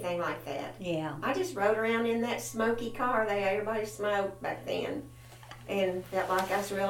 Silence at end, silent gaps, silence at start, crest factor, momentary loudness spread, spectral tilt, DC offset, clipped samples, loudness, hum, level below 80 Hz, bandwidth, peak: 0 s; none; 0 s; 16 dB; 9 LU; -4.5 dB/octave; under 0.1%; under 0.1%; -32 LUFS; none; -60 dBFS; 18 kHz; -14 dBFS